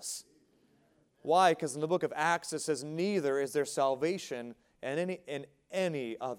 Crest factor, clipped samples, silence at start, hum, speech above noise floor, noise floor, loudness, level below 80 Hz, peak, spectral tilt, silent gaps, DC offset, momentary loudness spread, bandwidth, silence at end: 20 dB; under 0.1%; 0 s; none; 37 dB; -69 dBFS; -32 LUFS; -80 dBFS; -12 dBFS; -4 dB/octave; none; under 0.1%; 15 LU; 17 kHz; 0 s